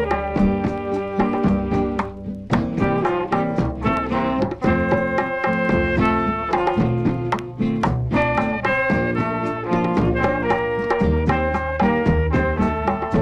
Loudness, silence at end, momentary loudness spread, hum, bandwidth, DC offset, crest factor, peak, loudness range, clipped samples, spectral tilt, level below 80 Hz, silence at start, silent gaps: -20 LUFS; 0 s; 4 LU; none; 9.4 kHz; under 0.1%; 16 dB; -4 dBFS; 2 LU; under 0.1%; -8 dB/octave; -32 dBFS; 0 s; none